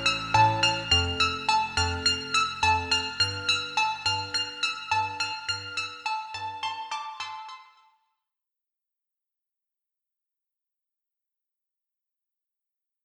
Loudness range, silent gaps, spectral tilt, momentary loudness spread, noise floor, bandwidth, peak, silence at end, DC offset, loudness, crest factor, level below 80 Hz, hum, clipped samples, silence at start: 15 LU; none; -2 dB/octave; 12 LU; -87 dBFS; 13.5 kHz; -8 dBFS; 5.4 s; under 0.1%; -26 LUFS; 22 dB; -56 dBFS; none; under 0.1%; 0 s